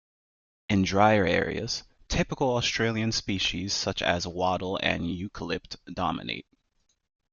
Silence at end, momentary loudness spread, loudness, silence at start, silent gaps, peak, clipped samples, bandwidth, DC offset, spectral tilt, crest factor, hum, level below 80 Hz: 0.9 s; 12 LU; -27 LUFS; 0.7 s; none; -8 dBFS; under 0.1%; 7.4 kHz; under 0.1%; -4.5 dB/octave; 20 dB; none; -48 dBFS